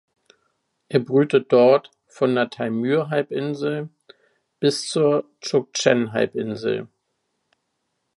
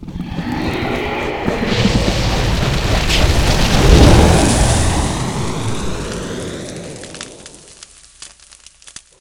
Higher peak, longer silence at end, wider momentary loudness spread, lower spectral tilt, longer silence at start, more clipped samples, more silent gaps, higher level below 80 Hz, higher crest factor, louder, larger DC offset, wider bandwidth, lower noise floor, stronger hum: about the same, -2 dBFS vs 0 dBFS; first, 1.3 s vs 0.95 s; second, 9 LU vs 25 LU; about the same, -5 dB/octave vs -5 dB/octave; first, 0.9 s vs 0 s; second, under 0.1% vs 0.2%; neither; second, -70 dBFS vs -20 dBFS; about the same, 20 dB vs 16 dB; second, -21 LUFS vs -15 LUFS; neither; second, 11.5 kHz vs 17.5 kHz; first, -75 dBFS vs -44 dBFS; neither